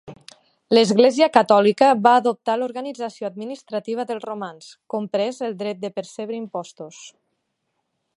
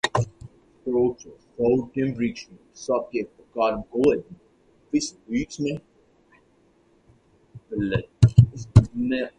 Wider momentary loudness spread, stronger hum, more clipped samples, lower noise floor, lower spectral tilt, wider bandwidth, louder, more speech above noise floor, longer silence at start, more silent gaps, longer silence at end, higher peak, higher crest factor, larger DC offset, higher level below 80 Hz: about the same, 17 LU vs 17 LU; neither; neither; first, -75 dBFS vs -61 dBFS; second, -5 dB/octave vs -7 dB/octave; about the same, 11 kHz vs 10.5 kHz; first, -20 LUFS vs -24 LUFS; first, 55 dB vs 36 dB; about the same, 0.05 s vs 0.05 s; neither; first, 1.05 s vs 0.1 s; about the same, 0 dBFS vs 0 dBFS; about the same, 20 dB vs 24 dB; neither; second, -72 dBFS vs -40 dBFS